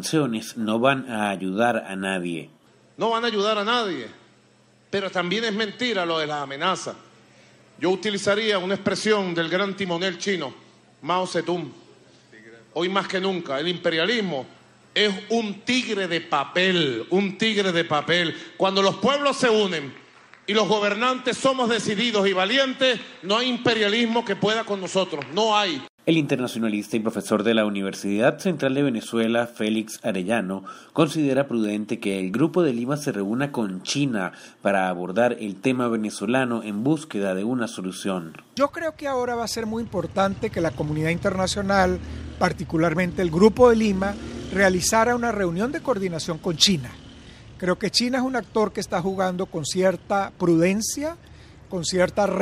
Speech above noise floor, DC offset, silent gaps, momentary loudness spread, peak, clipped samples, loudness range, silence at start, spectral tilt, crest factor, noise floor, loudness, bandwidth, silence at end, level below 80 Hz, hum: 34 dB; under 0.1%; 25.89-25.98 s; 8 LU; -2 dBFS; under 0.1%; 5 LU; 0 s; -4.5 dB/octave; 22 dB; -57 dBFS; -23 LUFS; 16 kHz; 0 s; -50 dBFS; none